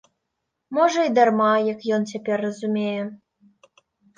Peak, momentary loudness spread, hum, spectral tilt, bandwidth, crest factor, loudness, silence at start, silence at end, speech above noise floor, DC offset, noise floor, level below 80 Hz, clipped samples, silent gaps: -4 dBFS; 10 LU; none; -5.5 dB/octave; 9.2 kHz; 18 dB; -22 LUFS; 0.7 s; 1 s; 58 dB; under 0.1%; -79 dBFS; -74 dBFS; under 0.1%; none